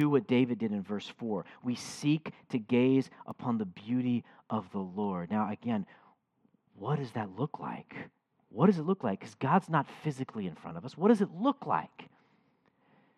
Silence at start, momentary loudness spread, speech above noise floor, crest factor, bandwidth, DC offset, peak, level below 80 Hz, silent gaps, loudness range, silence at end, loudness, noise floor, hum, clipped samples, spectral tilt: 0 s; 14 LU; 41 dB; 20 dB; 11.5 kHz; under 0.1%; -12 dBFS; -80 dBFS; none; 6 LU; 1.15 s; -32 LUFS; -72 dBFS; none; under 0.1%; -7.5 dB/octave